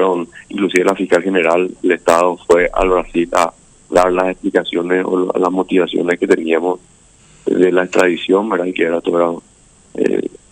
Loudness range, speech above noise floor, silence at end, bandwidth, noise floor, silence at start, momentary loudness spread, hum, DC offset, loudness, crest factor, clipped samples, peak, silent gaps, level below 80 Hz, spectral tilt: 2 LU; 32 dB; 0.25 s; 16 kHz; -47 dBFS; 0 s; 7 LU; none; under 0.1%; -15 LUFS; 16 dB; under 0.1%; 0 dBFS; none; -40 dBFS; -5 dB/octave